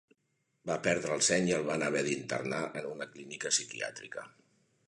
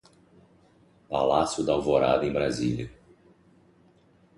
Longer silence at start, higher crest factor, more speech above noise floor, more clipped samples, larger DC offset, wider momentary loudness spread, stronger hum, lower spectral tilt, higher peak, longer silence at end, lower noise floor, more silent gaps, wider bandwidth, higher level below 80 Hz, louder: second, 0.65 s vs 1.1 s; about the same, 22 dB vs 20 dB; first, 46 dB vs 35 dB; neither; neither; first, 15 LU vs 10 LU; neither; second, -3 dB/octave vs -5.5 dB/octave; second, -12 dBFS vs -8 dBFS; second, 0.6 s vs 1.45 s; first, -79 dBFS vs -60 dBFS; neither; about the same, 11.5 kHz vs 11.5 kHz; second, -70 dBFS vs -52 dBFS; second, -32 LUFS vs -26 LUFS